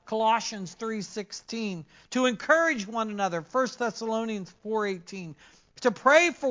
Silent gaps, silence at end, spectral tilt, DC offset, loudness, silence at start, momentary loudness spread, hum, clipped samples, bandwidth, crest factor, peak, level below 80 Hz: none; 0 s; -3.5 dB/octave; under 0.1%; -27 LUFS; 0.05 s; 16 LU; none; under 0.1%; 7.6 kHz; 22 dB; -6 dBFS; -70 dBFS